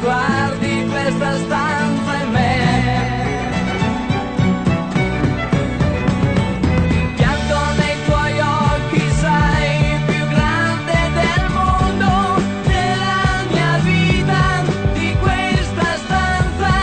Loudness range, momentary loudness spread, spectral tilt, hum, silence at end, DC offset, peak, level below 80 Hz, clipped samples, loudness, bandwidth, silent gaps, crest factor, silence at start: 2 LU; 4 LU; -6 dB/octave; none; 0 s; under 0.1%; -4 dBFS; -26 dBFS; under 0.1%; -17 LUFS; 9.2 kHz; none; 12 dB; 0 s